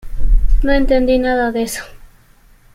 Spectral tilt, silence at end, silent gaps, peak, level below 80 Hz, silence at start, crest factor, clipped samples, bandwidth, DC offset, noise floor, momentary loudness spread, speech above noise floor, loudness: -5.5 dB/octave; 0.7 s; none; -2 dBFS; -18 dBFS; 0.05 s; 12 dB; under 0.1%; 15 kHz; under 0.1%; -47 dBFS; 10 LU; 33 dB; -17 LUFS